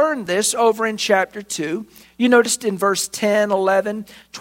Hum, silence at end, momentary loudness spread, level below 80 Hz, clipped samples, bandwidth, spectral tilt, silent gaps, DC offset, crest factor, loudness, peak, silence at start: none; 0 s; 11 LU; -62 dBFS; under 0.1%; 16.5 kHz; -3 dB/octave; none; under 0.1%; 18 dB; -18 LUFS; -2 dBFS; 0 s